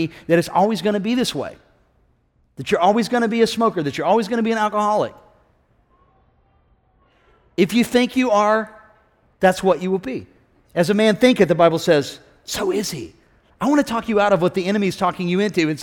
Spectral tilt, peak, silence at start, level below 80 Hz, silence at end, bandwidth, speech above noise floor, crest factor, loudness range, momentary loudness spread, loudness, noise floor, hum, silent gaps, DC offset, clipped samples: -5.5 dB/octave; -2 dBFS; 0 s; -54 dBFS; 0 s; 17.5 kHz; 43 dB; 18 dB; 5 LU; 13 LU; -19 LUFS; -61 dBFS; none; none; under 0.1%; under 0.1%